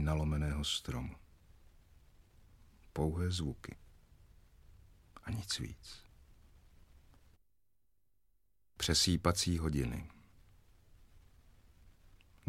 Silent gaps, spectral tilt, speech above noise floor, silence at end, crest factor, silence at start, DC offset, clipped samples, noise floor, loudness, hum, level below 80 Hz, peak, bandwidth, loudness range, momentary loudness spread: none; -4 dB/octave; 46 dB; 0 s; 26 dB; 0 s; under 0.1%; under 0.1%; -82 dBFS; -36 LUFS; none; -50 dBFS; -14 dBFS; 16 kHz; 11 LU; 22 LU